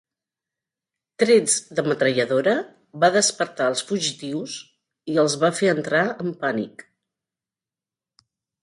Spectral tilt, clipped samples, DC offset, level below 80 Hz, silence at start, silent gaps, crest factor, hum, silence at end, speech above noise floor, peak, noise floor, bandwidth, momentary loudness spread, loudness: -3.5 dB/octave; under 0.1%; under 0.1%; -70 dBFS; 1.2 s; none; 20 dB; none; 1.95 s; over 69 dB; -4 dBFS; under -90 dBFS; 11.5 kHz; 13 LU; -21 LUFS